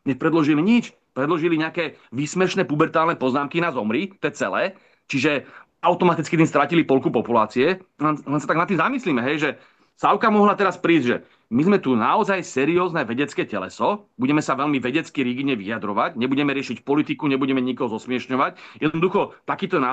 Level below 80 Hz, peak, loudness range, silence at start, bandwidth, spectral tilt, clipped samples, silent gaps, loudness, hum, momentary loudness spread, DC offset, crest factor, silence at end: -66 dBFS; -4 dBFS; 3 LU; 0.05 s; 8.6 kHz; -6 dB/octave; under 0.1%; none; -21 LUFS; none; 8 LU; under 0.1%; 18 dB; 0 s